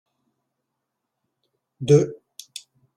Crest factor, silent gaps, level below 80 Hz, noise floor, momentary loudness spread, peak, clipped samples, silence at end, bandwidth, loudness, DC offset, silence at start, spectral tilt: 22 dB; none; -62 dBFS; -80 dBFS; 22 LU; -4 dBFS; under 0.1%; 0.85 s; 12.5 kHz; -19 LUFS; under 0.1%; 1.8 s; -7 dB/octave